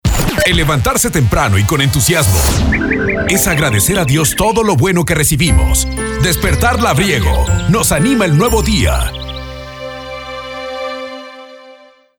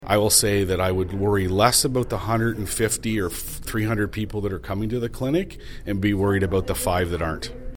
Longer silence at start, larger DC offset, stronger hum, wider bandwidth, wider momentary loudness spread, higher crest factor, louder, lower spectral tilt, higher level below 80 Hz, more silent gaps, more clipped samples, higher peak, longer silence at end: about the same, 0.05 s vs 0 s; neither; neither; about the same, over 20 kHz vs 19 kHz; first, 14 LU vs 11 LU; second, 12 dB vs 20 dB; first, -12 LUFS vs -23 LUFS; about the same, -4 dB/octave vs -4 dB/octave; first, -20 dBFS vs -38 dBFS; neither; neither; about the same, -2 dBFS vs -2 dBFS; first, 0.45 s vs 0 s